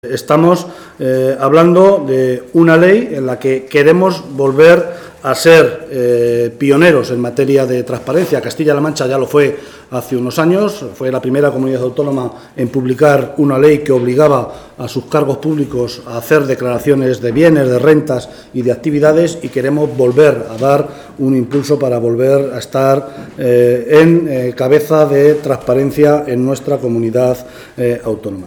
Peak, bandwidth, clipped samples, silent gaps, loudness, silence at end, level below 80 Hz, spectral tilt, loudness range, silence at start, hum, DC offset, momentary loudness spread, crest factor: 0 dBFS; 19.5 kHz; 0.2%; none; -12 LUFS; 0 s; -48 dBFS; -6.5 dB/octave; 4 LU; 0.05 s; none; under 0.1%; 11 LU; 12 dB